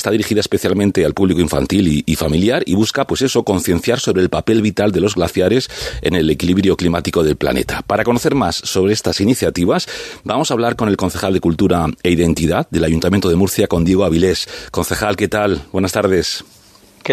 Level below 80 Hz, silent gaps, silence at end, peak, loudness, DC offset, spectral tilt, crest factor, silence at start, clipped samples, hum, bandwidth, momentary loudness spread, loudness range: -38 dBFS; none; 0 s; 0 dBFS; -16 LUFS; under 0.1%; -5.5 dB/octave; 14 dB; 0 s; under 0.1%; none; 14 kHz; 4 LU; 1 LU